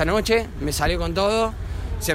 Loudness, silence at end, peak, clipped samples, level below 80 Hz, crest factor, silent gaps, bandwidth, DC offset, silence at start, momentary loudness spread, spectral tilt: -23 LUFS; 0 s; -6 dBFS; under 0.1%; -30 dBFS; 16 dB; none; 16 kHz; under 0.1%; 0 s; 8 LU; -4.5 dB/octave